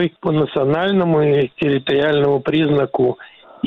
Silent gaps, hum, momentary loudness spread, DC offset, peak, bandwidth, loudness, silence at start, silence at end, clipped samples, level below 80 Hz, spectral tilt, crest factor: none; none; 4 LU; 0.2%; -6 dBFS; 4.9 kHz; -17 LUFS; 0 s; 0 s; under 0.1%; -52 dBFS; -9 dB/octave; 10 dB